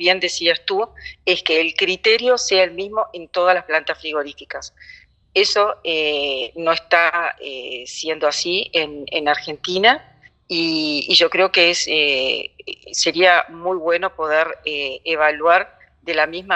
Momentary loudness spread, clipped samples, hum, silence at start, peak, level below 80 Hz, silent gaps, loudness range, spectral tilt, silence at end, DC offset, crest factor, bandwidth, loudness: 12 LU; under 0.1%; none; 0 s; 0 dBFS; -58 dBFS; none; 4 LU; -1.5 dB/octave; 0 s; under 0.1%; 18 dB; 8.6 kHz; -18 LUFS